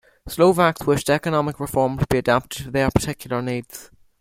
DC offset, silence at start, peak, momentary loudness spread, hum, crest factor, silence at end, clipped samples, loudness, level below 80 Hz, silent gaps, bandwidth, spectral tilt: under 0.1%; 0.25 s; -2 dBFS; 11 LU; none; 18 dB; 0.35 s; under 0.1%; -21 LUFS; -42 dBFS; none; 16.5 kHz; -5.5 dB/octave